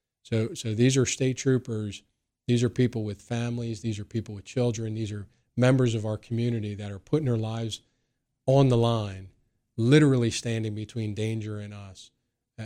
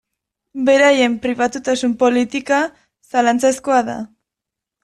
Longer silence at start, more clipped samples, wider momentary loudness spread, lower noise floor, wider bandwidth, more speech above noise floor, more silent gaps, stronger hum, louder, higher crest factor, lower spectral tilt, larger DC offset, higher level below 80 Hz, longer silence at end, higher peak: second, 0.3 s vs 0.55 s; neither; about the same, 15 LU vs 13 LU; second, -77 dBFS vs -84 dBFS; second, 11 kHz vs 12.5 kHz; second, 51 dB vs 68 dB; neither; neither; second, -27 LUFS vs -16 LUFS; about the same, 20 dB vs 16 dB; first, -6 dB/octave vs -3 dB/octave; neither; about the same, -56 dBFS vs -58 dBFS; second, 0 s vs 0.8 s; second, -8 dBFS vs -2 dBFS